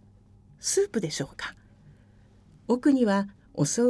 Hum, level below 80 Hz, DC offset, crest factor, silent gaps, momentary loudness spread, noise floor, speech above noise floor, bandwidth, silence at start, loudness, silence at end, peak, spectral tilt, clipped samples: none; -60 dBFS; under 0.1%; 16 dB; none; 15 LU; -56 dBFS; 31 dB; 11 kHz; 0.65 s; -27 LUFS; 0 s; -12 dBFS; -4.5 dB/octave; under 0.1%